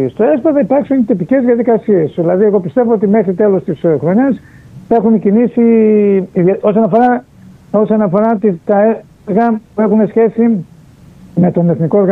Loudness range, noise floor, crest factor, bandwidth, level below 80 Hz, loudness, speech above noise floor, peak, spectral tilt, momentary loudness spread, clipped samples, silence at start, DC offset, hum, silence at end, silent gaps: 2 LU; -39 dBFS; 10 dB; 3.9 kHz; -52 dBFS; -12 LUFS; 29 dB; 0 dBFS; -11 dB/octave; 5 LU; under 0.1%; 0 s; under 0.1%; none; 0 s; none